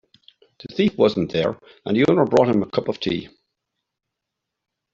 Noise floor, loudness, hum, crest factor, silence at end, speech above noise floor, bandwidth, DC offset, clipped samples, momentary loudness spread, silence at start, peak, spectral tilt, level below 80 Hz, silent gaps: -82 dBFS; -20 LUFS; none; 20 dB; 1.65 s; 62 dB; 7.6 kHz; under 0.1%; under 0.1%; 10 LU; 0.65 s; -2 dBFS; -5 dB/octave; -58 dBFS; none